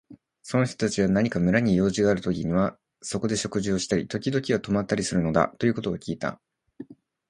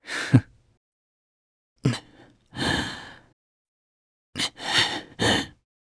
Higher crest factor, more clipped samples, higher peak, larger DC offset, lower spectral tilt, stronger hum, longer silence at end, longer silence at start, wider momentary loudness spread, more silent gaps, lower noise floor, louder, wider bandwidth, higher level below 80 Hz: about the same, 22 dB vs 26 dB; neither; about the same, -4 dBFS vs -2 dBFS; neither; first, -5.5 dB/octave vs -4 dB/octave; neither; about the same, 0.35 s vs 0.35 s; about the same, 0.1 s vs 0.05 s; second, 10 LU vs 17 LU; second, none vs 0.77-1.76 s, 3.33-4.33 s; second, -45 dBFS vs -54 dBFS; about the same, -25 LUFS vs -25 LUFS; about the same, 11.5 kHz vs 11 kHz; about the same, -50 dBFS vs -52 dBFS